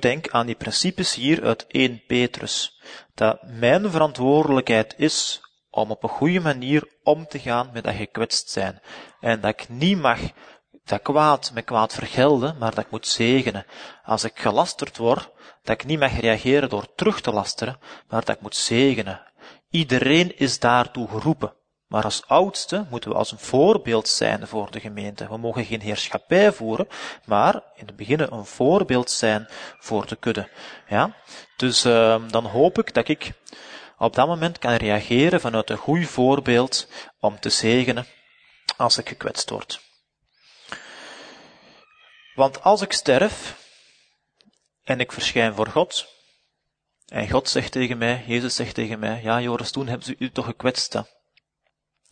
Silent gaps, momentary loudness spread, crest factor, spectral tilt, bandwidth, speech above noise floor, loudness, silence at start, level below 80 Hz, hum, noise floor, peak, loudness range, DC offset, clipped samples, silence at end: none; 14 LU; 22 dB; -4.5 dB/octave; 9.6 kHz; 56 dB; -22 LUFS; 0 s; -52 dBFS; none; -78 dBFS; 0 dBFS; 4 LU; under 0.1%; under 0.1%; 1.1 s